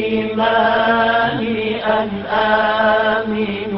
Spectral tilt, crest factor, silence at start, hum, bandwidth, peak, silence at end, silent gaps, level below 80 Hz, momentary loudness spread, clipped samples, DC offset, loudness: -10 dB/octave; 12 dB; 0 s; none; 5.8 kHz; -4 dBFS; 0 s; none; -46 dBFS; 5 LU; under 0.1%; under 0.1%; -16 LUFS